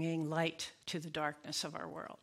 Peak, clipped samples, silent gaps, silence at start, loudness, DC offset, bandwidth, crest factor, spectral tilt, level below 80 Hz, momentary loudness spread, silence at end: -20 dBFS; under 0.1%; none; 0 s; -39 LUFS; under 0.1%; 16 kHz; 20 dB; -4 dB/octave; -76 dBFS; 8 LU; 0.05 s